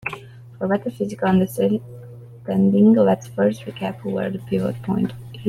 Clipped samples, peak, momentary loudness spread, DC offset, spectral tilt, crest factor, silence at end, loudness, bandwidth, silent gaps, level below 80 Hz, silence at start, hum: under 0.1%; -4 dBFS; 17 LU; under 0.1%; -8 dB/octave; 16 dB; 0 s; -21 LUFS; 14 kHz; none; -56 dBFS; 0.05 s; none